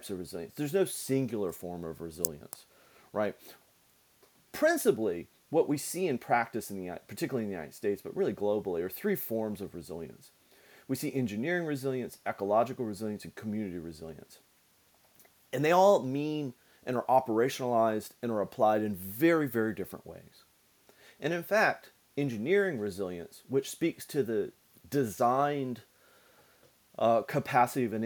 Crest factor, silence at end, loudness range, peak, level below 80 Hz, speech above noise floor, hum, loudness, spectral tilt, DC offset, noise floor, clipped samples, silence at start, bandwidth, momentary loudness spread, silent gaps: 28 dB; 0 s; 6 LU; -4 dBFS; -70 dBFS; 36 dB; none; -31 LUFS; -5.5 dB/octave; under 0.1%; -67 dBFS; under 0.1%; 0 s; 19 kHz; 14 LU; none